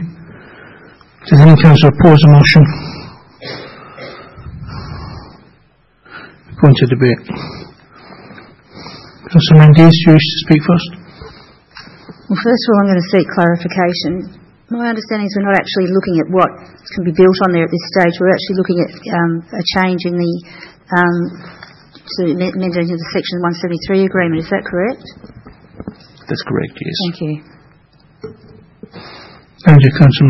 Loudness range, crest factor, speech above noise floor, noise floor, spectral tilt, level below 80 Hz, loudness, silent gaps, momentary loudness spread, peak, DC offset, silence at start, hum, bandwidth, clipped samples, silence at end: 14 LU; 12 dB; 41 dB; -52 dBFS; -8 dB/octave; -40 dBFS; -11 LUFS; none; 26 LU; 0 dBFS; under 0.1%; 0 s; none; 6 kHz; 0.5%; 0 s